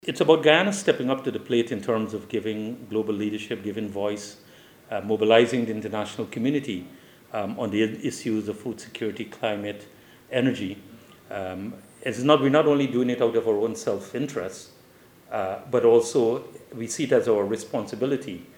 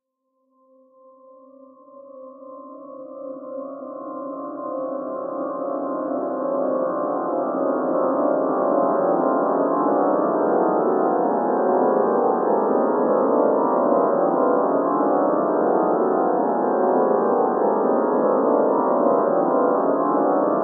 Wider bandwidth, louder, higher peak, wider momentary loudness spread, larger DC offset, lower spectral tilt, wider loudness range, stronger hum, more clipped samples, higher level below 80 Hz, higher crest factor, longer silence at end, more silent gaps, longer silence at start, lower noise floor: first, 17 kHz vs 2 kHz; second, -25 LUFS vs -20 LUFS; first, -2 dBFS vs -6 dBFS; about the same, 15 LU vs 13 LU; neither; second, -5 dB/octave vs -14.5 dB/octave; second, 6 LU vs 13 LU; neither; neither; first, -70 dBFS vs -84 dBFS; first, 22 dB vs 14 dB; about the same, 0.1 s vs 0 s; neither; second, 0.05 s vs 1.95 s; second, -53 dBFS vs -72 dBFS